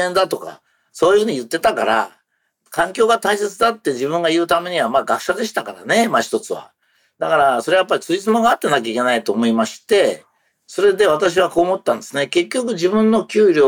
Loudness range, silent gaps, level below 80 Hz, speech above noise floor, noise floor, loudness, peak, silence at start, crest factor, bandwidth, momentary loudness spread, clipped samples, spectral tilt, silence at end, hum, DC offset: 2 LU; none; -58 dBFS; 48 dB; -65 dBFS; -17 LUFS; -6 dBFS; 0 s; 12 dB; 18.5 kHz; 8 LU; under 0.1%; -4 dB/octave; 0 s; none; under 0.1%